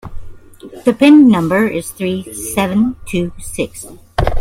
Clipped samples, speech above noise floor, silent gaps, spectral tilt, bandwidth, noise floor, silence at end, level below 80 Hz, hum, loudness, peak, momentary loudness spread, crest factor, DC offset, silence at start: under 0.1%; 22 dB; none; -5.5 dB/octave; 16 kHz; -35 dBFS; 0 s; -30 dBFS; none; -14 LUFS; 0 dBFS; 15 LU; 14 dB; under 0.1%; 0.05 s